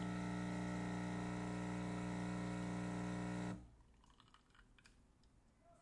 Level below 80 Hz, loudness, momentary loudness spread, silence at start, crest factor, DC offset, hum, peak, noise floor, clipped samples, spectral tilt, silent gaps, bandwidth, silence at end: -62 dBFS; -45 LUFS; 2 LU; 0 s; 12 dB; under 0.1%; none; -34 dBFS; -71 dBFS; under 0.1%; -6.5 dB/octave; none; 11 kHz; 0.05 s